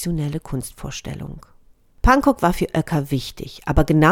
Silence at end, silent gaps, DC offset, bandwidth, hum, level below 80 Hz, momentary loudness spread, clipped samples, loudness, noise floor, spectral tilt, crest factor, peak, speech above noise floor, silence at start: 0 s; none; under 0.1%; 17.5 kHz; none; -30 dBFS; 16 LU; under 0.1%; -21 LUFS; -51 dBFS; -6 dB/octave; 18 dB; -2 dBFS; 31 dB; 0 s